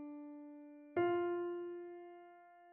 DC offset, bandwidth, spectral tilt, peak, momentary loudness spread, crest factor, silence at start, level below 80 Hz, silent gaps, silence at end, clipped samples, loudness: under 0.1%; 3 kHz; -5 dB/octave; -24 dBFS; 21 LU; 18 dB; 0 s; -88 dBFS; none; 0 s; under 0.1%; -41 LUFS